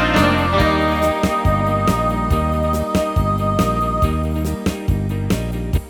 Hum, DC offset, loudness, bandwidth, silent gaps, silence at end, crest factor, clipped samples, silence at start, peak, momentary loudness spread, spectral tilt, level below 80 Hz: none; under 0.1%; -18 LUFS; 19.5 kHz; none; 0 s; 16 dB; under 0.1%; 0 s; -2 dBFS; 6 LU; -6.5 dB/octave; -26 dBFS